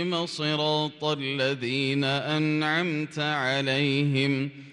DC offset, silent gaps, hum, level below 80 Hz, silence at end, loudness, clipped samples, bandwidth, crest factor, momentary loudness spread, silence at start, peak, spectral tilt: under 0.1%; none; none; -70 dBFS; 0 s; -26 LUFS; under 0.1%; 11 kHz; 14 dB; 4 LU; 0 s; -12 dBFS; -5.5 dB/octave